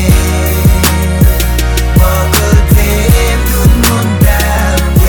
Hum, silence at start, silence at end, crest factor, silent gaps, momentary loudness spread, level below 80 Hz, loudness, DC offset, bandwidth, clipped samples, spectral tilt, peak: none; 0 s; 0 s; 8 dB; none; 3 LU; -10 dBFS; -9 LUFS; under 0.1%; 19.5 kHz; 0.6%; -5 dB/octave; 0 dBFS